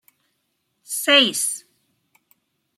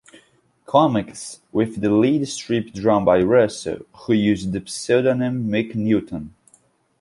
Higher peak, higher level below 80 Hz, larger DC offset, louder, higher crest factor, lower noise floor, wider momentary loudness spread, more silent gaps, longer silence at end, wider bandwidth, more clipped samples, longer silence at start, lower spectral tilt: about the same, -2 dBFS vs -4 dBFS; second, -80 dBFS vs -52 dBFS; neither; first, -17 LUFS vs -20 LUFS; about the same, 22 dB vs 18 dB; first, -73 dBFS vs -59 dBFS; about the same, 15 LU vs 14 LU; neither; first, 1.2 s vs 0.7 s; first, 16 kHz vs 11.5 kHz; neither; first, 0.9 s vs 0.7 s; second, 0 dB/octave vs -6 dB/octave